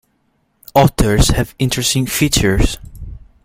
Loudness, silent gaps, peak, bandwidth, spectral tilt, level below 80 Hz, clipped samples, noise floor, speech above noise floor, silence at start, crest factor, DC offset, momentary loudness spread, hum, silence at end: -15 LUFS; none; 0 dBFS; 16.5 kHz; -4.5 dB/octave; -24 dBFS; under 0.1%; -62 dBFS; 49 dB; 0.75 s; 16 dB; under 0.1%; 18 LU; none; 0.25 s